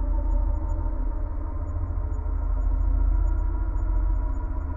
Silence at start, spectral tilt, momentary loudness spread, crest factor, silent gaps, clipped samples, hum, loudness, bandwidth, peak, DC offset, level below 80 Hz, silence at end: 0 s; -11 dB/octave; 6 LU; 10 dB; none; under 0.1%; none; -29 LUFS; 2.1 kHz; -14 dBFS; under 0.1%; -24 dBFS; 0 s